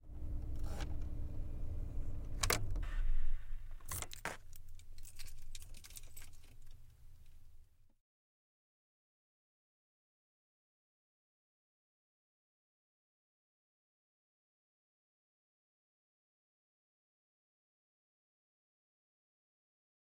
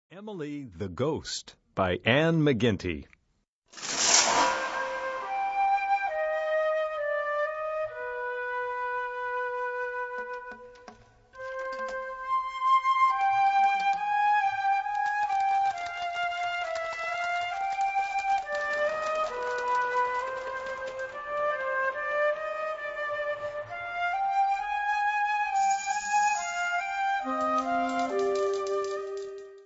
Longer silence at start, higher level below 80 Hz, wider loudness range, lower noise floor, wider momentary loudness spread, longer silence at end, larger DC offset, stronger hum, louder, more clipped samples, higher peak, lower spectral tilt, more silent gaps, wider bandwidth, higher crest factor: about the same, 0.05 s vs 0.1 s; first, -46 dBFS vs -62 dBFS; first, 17 LU vs 6 LU; second, -59 dBFS vs -74 dBFS; first, 23 LU vs 12 LU; first, 12.55 s vs 0 s; neither; neither; second, -45 LUFS vs -28 LUFS; neither; second, -16 dBFS vs -6 dBFS; about the same, -3 dB/octave vs -3 dB/octave; second, none vs 3.48-3.62 s; first, 16.5 kHz vs 8 kHz; about the same, 26 dB vs 22 dB